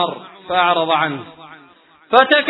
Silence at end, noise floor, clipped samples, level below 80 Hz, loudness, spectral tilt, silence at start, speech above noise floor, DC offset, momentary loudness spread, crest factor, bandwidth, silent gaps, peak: 0 s; -49 dBFS; under 0.1%; -62 dBFS; -16 LUFS; -6.5 dB/octave; 0 s; 33 dB; under 0.1%; 18 LU; 18 dB; 5.4 kHz; none; 0 dBFS